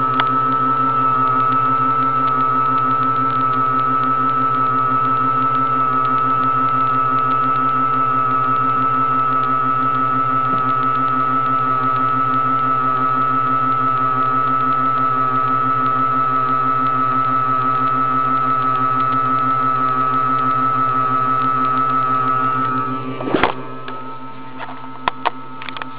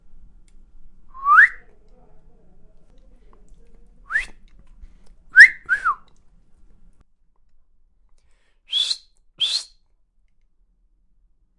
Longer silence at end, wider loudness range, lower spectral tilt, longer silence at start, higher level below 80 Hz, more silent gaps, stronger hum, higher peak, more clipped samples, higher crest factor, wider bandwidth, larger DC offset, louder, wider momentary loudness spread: second, 0 s vs 1.95 s; second, 1 LU vs 14 LU; first, -9 dB/octave vs 2 dB/octave; second, 0 s vs 0.8 s; second, -58 dBFS vs -50 dBFS; neither; neither; about the same, 0 dBFS vs 0 dBFS; neither; second, 18 dB vs 24 dB; second, 4 kHz vs 11.5 kHz; first, 4% vs under 0.1%; about the same, -16 LUFS vs -16 LUFS; second, 4 LU vs 17 LU